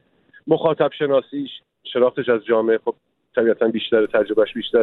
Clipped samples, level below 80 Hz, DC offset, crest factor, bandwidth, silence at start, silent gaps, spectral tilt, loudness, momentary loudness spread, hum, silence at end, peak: under 0.1%; -62 dBFS; under 0.1%; 16 dB; 4.1 kHz; 0.45 s; none; -8.5 dB/octave; -20 LUFS; 11 LU; none; 0 s; -4 dBFS